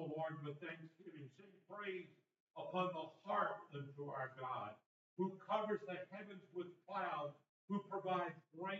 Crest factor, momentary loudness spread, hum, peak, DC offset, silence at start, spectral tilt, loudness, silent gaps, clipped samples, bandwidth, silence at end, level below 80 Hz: 20 dB; 16 LU; none; -26 dBFS; under 0.1%; 0 s; -4.5 dB/octave; -46 LUFS; 2.40-2.47 s, 4.86-5.17 s, 7.49-7.68 s; under 0.1%; 7.4 kHz; 0 s; under -90 dBFS